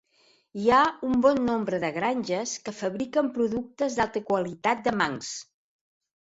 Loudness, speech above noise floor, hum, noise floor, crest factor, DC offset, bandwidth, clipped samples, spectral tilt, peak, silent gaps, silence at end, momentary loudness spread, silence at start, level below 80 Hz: -26 LUFS; 38 dB; none; -64 dBFS; 18 dB; under 0.1%; 8 kHz; under 0.1%; -4.5 dB/octave; -8 dBFS; none; 0.75 s; 10 LU; 0.55 s; -60 dBFS